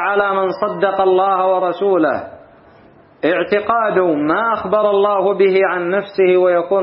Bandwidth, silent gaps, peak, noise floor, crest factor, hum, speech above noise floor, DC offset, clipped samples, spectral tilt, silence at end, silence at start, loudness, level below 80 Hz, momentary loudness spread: 5.6 kHz; none; -2 dBFS; -46 dBFS; 14 dB; none; 31 dB; under 0.1%; under 0.1%; -11 dB/octave; 0 s; 0 s; -15 LUFS; -58 dBFS; 5 LU